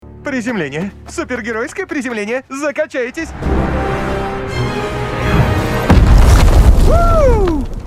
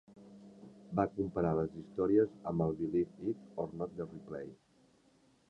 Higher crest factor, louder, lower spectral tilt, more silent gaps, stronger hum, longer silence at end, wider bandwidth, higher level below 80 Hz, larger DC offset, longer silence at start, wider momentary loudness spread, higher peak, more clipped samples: second, 12 dB vs 20 dB; first, -15 LUFS vs -36 LUFS; second, -6.5 dB/octave vs -10.5 dB/octave; neither; neither; second, 0 s vs 0.95 s; first, 15 kHz vs 7.8 kHz; first, -16 dBFS vs -62 dBFS; neither; about the same, 0.05 s vs 0.1 s; second, 11 LU vs 23 LU; first, 0 dBFS vs -16 dBFS; neither